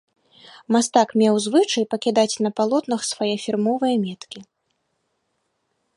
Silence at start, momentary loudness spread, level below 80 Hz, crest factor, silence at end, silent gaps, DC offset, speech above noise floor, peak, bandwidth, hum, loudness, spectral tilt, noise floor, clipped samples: 0.7 s; 8 LU; -72 dBFS; 20 dB; 1.55 s; none; under 0.1%; 52 dB; -2 dBFS; 11.5 kHz; none; -20 LUFS; -4 dB/octave; -73 dBFS; under 0.1%